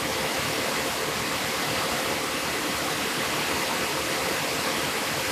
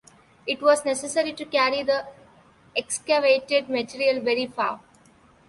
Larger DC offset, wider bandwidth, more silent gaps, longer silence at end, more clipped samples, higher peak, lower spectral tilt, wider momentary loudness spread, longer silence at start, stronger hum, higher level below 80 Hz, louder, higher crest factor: neither; first, 16 kHz vs 11.5 kHz; neither; second, 0 s vs 0.7 s; neither; second, -14 dBFS vs -6 dBFS; about the same, -2 dB/octave vs -2 dB/octave; second, 1 LU vs 10 LU; second, 0 s vs 0.45 s; neither; first, -52 dBFS vs -66 dBFS; about the same, -26 LUFS vs -24 LUFS; second, 14 dB vs 20 dB